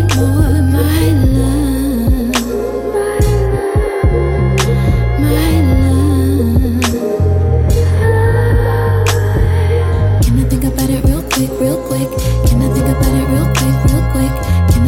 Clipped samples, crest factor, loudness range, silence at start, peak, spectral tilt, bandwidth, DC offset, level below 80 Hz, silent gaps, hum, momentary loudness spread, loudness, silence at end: under 0.1%; 10 dB; 2 LU; 0 s; 0 dBFS; -6.5 dB/octave; 17 kHz; under 0.1%; -18 dBFS; none; none; 4 LU; -13 LUFS; 0 s